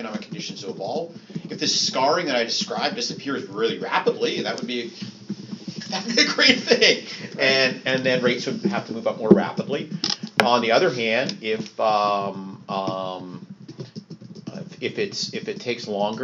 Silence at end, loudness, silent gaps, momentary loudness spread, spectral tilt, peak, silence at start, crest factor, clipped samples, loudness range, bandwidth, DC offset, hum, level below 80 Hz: 0 s; -22 LUFS; none; 18 LU; -2 dB/octave; 0 dBFS; 0 s; 24 dB; under 0.1%; 9 LU; 7.6 kHz; under 0.1%; none; -68 dBFS